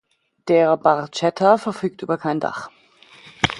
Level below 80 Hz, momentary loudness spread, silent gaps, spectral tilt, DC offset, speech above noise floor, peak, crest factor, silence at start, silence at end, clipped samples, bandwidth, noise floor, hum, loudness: -52 dBFS; 13 LU; none; -5.5 dB/octave; under 0.1%; 29 dB; 0 dBFS; 20 dB; 0.45 s; 0 s; under 0.1%; 11.5 kHz; -48 dBFS; none; -20 LUFS